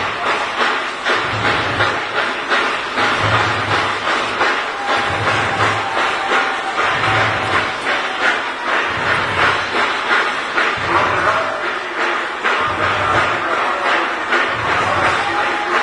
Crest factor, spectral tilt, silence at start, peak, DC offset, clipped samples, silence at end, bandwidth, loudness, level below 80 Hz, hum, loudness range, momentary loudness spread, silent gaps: 16 dB; -3.5 dB/octave; 0 s; 0 dBFS; under 0.1%; under 0.1%; 0 s; 11 kHz; -16 LUFS; -48 dBFS; none; 1 LU; 3 LU; none